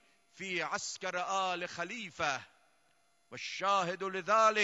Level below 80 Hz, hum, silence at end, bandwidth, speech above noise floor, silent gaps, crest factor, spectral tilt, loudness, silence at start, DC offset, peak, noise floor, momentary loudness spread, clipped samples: -78 dBFS; none; 0 s; 11.5 kHz; 39 dB; none; 20 dB; -2.5 dB/octave; -34 LUFS; 0.35 s; under 0.1%; -14 dBFS; -73 dBFS; 11 LU; under 0.1%